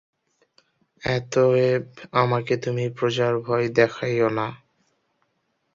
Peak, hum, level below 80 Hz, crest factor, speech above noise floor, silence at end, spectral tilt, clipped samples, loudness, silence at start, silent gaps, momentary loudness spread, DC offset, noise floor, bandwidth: -4 dBFS; none; -58 dBFS; 20 dB; 50 dB; 1.2 s; -6.5 dB/octave; under 0.1%; -23 LUFS; 1.05 s; none; 7 LU; under 0.1%; -72 dBFS; 7.6 kHz